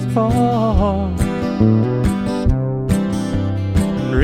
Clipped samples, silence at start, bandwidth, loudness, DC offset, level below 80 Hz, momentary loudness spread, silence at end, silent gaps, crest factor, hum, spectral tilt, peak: under 0.1%; 0 s; 13.5 kHz; -18 LUFS; under 0.1%; -26 dBFS; 5 LU; 0 s; none; 14 dB; none; -8 dB/octave; -2 dBFS